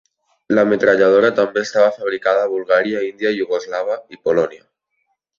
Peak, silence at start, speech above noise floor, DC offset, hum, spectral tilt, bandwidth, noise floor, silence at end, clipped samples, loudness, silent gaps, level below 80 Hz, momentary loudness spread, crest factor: -2 dBFS; 0.5 s; 54 dB; under 0.1%; none; -5 dB/octave; 7.4 kHz; -70 dBFS; 0.85 s; under 0.1%; -17 LUFS; none; -60 dBFS; 9 LU; 16 dB